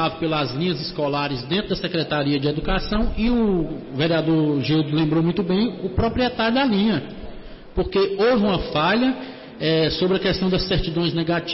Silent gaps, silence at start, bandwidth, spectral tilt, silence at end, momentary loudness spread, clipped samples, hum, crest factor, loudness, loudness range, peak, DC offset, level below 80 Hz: none; 0 s; 5.8 kHz; -9.5 dB/octave; 0 s; 6 LU; under 0.1%; none; 10 dB; -21 LUFS; 2 LU; -10 dBFS; under 0.1%; -36 dBFS